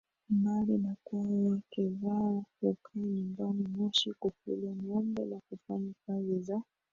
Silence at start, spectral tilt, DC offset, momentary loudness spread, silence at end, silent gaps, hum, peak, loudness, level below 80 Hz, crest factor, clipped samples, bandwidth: 0.3 s; -7 dB/octave; under 0.1%; 9 LU; 0.3 s; none; none; -16 dBFS; -34 LUFS; -72 dBFS; 18 dB; under 0.1%; 7.4 kHz